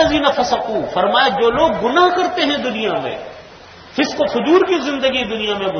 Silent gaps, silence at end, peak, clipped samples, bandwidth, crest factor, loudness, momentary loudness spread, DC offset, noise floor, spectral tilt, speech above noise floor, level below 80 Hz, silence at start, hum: none; 0 s; 0 dBFS; under 0.1%; 6.6 kHz; 16 dB; -16 LUFS; 7 LU; under 0.1%; -39 dBFS; -4 dB/octave; 23 dB; -46 dBFS; 0 s; none